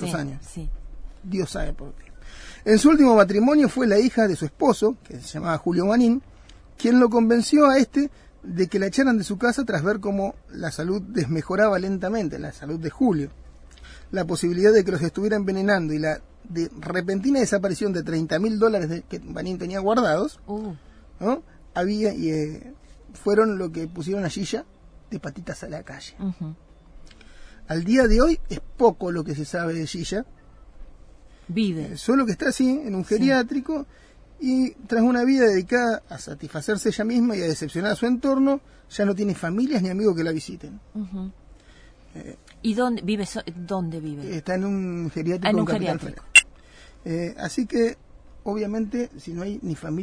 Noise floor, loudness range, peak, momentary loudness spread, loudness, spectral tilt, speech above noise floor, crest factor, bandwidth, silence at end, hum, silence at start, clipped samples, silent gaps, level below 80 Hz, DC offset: -50 dBFS; 8 LU; -2 dBFS; 17 LU; -23 LUFS; -5.5 dB/octave; 27 dB; 22 dB; 11 kHz; 0 s; none; 0 s; under 0.1%; none; -40 dBFS; under 0.1%